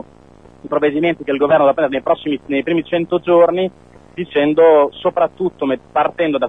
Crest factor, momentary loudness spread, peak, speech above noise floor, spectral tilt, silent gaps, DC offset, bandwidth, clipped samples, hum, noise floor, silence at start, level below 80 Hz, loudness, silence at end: 16 dB; 9 LU; 0 dBFS; 29 dB; -8 dB/octave; none; 0.2%; 3.9 kHz; under 0.1%; none; -44 dBFS; 0.65 s; -52 dBFS; -16 LUFS; 0 s